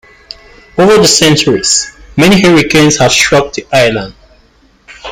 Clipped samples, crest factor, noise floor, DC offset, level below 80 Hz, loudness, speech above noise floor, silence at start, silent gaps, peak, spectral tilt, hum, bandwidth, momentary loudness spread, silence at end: under 0.1%; 10 dB; -46 dBFS; under 0.1%; -38 dBFS; -7 LUFS; 39 dB; 0.75 s; none; 0 dBFS; -3.5 dB/octave; none; 17 kHz; 13 LU; 0 s